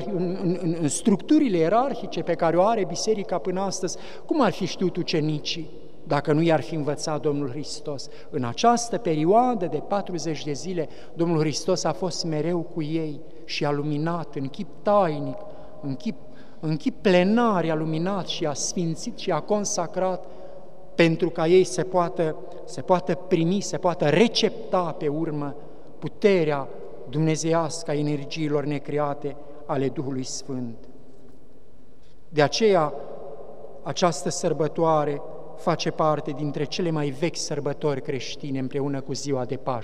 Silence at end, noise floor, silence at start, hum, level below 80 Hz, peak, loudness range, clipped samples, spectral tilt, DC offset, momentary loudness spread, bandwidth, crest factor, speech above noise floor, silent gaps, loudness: 0 s; -54 dBFS; 0 s; none; -58 dBFS; -4 dBFS; 4 LU; under 0.1%; -5.5 dB/octave; 2%; 14 LU; 12.5 kHz; 22 dB; 30 dB; none; -25 LUFS